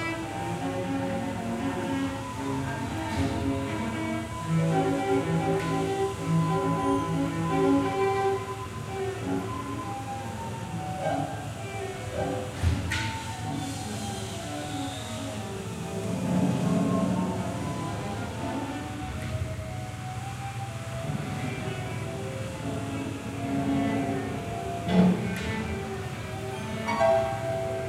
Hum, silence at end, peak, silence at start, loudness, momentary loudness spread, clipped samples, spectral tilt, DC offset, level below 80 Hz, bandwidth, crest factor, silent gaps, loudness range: none; 0 s; -10 dBFS; 0 s; -30 LUFS; 9 LU; under 0.1%; -6 dB/octave; under 0.1%; -48 dBFS; 16 kHz; 20 dB; none; 7 LU